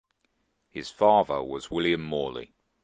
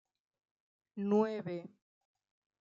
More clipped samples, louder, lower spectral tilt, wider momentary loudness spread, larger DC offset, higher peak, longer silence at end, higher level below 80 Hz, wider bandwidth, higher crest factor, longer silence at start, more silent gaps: neither; first, -26 LUFS vs -35 LUFS; second, -5.5 dB/octave vs -8.5 dB/octave; first, 18 LU vs 14 LU; neither; first, -8 dBFS vs -18 dBFS; second, 0.4 s vs 0.95 s; first, -58 dBFS vs -90 dBFS; first, 9.6 kHz vs 7.2 kHz; about the same, 20 dB vs 20 dB; second, 0.75 s vs 0.95 s; neither